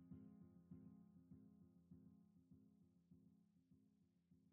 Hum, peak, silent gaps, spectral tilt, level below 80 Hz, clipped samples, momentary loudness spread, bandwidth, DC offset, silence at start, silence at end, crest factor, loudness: none; -50 dBFS; none; -11.5 dB/octave; -88 dBFS; under 0.1%; 5 LU; 2.1 kHz; under 0.1%; 0 s; 0 s; 18 dB; -67 LUFS